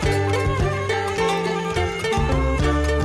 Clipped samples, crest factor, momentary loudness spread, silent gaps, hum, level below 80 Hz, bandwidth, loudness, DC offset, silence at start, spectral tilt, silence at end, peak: under 0.1%; 12 dB; 2 LU; none; none; -28 dBFS; 13.5 kHz; -22 LUFS; under 0.1%; 0 s; -5.5 dB/octave; 0 s; -8 dBFS